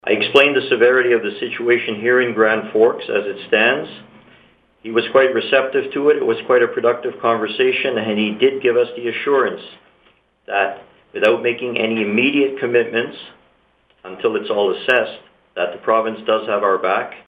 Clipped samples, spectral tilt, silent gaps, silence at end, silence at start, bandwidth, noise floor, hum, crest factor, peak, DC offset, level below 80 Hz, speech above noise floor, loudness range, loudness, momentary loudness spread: under 0.1%; -6 dB/octave; none; 0.05 s; 0.05 s; 7.4 kHz; -58 dBFS; none; 18 dB; 0 dBFS; under 0.1%; -66 dBFS; 41 dB; 4 LU; -17 LUFS; 8 LU